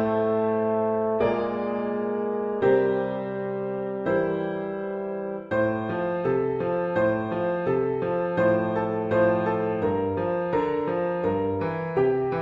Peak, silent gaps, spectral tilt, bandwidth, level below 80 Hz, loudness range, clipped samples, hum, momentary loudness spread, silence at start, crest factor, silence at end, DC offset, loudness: -10 dBFS; none; -9.5 dB/octave; 5.6 kHz; -54 dBFS; 3 LU; under 0.1%; none; 7 LU; 0 s; 14 dB; 0 s; under 0.1%; -25 LUFS